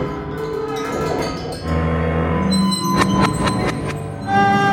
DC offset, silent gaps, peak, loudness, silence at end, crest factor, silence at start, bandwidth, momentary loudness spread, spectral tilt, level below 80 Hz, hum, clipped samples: under 0.1%; none; -2 dBFS; -19 LUFS; 0 s; 16 dB; 0 s; 16.5 kHz; 9 LU; -5.5 dB/octave; -36 dBFS; none; under 0.1%